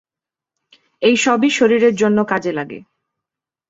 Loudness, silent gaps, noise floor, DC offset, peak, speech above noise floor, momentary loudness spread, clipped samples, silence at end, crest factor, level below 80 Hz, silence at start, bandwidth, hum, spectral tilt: -15 LUFS; none; -88 dBFS; under 0.1%; -2 dBFS; 73 dB; 13 LU; under 0.1%; 0.9 s; 16 dB; -62 dBFS; 1 s; 8 kHz; none; -4 dB/octave